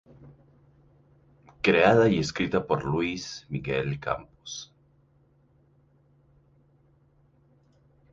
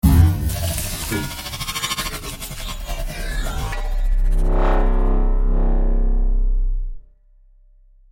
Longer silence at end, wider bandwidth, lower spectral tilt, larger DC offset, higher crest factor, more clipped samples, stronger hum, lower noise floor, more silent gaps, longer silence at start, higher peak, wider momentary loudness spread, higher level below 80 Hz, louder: first, 3.5 s vs 1.1 s; second, 7.8 kHz vs 17 kHz; about the same, -5.5 dB/octave vs -5 dB/octave; neither; about the same, 22 dB vs 18 dB; neither; neither; first, -63 dBFS vs -50 dBFS; neither; first, 0.25 s vs 0.05 s; second, -8 dBFS vs -2 dBFS; first, 19 LU vs 9 LU; second, -56 dBFS vs -20 dBFS; second, -26 LUFS vs -23 LUFS